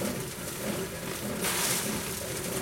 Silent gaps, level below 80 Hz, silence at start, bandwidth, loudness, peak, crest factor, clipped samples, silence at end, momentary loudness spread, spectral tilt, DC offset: none; -54 dBFS; 0 s; 16.5 kHz; -31 LUFS; -14 dBFS; 20 dB; under 0.1%; 0 s; 8 LU; -3 dB/octave; under 0.1%